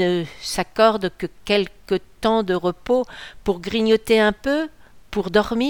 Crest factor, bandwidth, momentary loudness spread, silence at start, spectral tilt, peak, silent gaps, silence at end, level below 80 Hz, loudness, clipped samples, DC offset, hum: 18 dB; 19 kHz; 10 LU; 0 s; -5 dB/octave; -2 dBFS; none; 0 s; -46 dBFS; -21 LUFS; under 0.1%; 0.4%; none